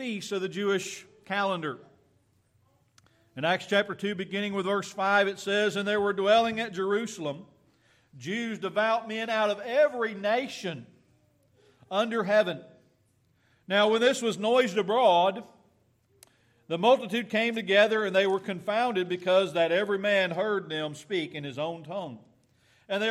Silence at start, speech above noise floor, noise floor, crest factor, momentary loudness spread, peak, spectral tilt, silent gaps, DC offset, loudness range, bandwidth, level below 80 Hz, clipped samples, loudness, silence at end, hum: 0 s; 41 dB; -68 dBFS; 20 dB; 13 LU; -8 dBFS; -4.5 dB/octave; none; under 0.1%; 6 LU; 14 kHz; -76 dBFS; under 0.1%; -27 LUFS; 0 s; none